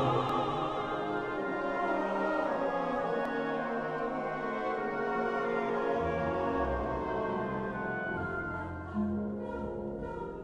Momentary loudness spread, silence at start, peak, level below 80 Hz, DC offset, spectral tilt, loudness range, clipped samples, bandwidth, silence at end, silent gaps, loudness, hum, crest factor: 6 LU; 0 s; -18 dBFS; -52 dBFS; under 0.1%; -7.5 dB/octave; 2 LU; under 0.1%; 11 kHz; 0 s; none; -33 LUFS; none; 16 dB